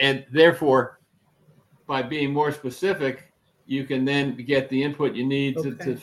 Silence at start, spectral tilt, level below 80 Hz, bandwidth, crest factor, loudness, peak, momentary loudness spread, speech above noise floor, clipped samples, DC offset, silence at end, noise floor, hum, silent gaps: 0 s; -6 dB/octave; -66 dBFS; 12.5 kHz; 20 dB; -23 LUFS; -4 dBFS; 11 LU; 40 dB; under 0.1%; under 0.1%; 0 s; -63 dBFS; none; none